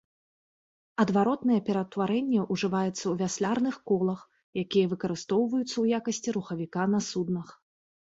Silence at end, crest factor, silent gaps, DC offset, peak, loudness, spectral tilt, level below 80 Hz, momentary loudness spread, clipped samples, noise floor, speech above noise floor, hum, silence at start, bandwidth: 0.6 s; 18 dB; 4.43-4.53 s; under 0.1%; -10 dBFS; -28 LUFS; -5.5 dB/octave; -68 dBFS; 7 LU; under 0.1%; under -90 dBFS; over 62 dB; none; 1 s; 8 kHz